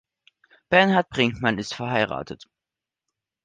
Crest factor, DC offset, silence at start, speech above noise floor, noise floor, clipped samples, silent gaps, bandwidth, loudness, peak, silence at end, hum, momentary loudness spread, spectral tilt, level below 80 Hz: 22 dB; under 0.1%; 0.7 s; 66 dB; -88 dBFS; under 0.1%; none; 9.6 kHz; -22 LUFS; -4 dBFS; 1.1 s; none; 16 LU; -5.5 dB/octave; -56 dBFS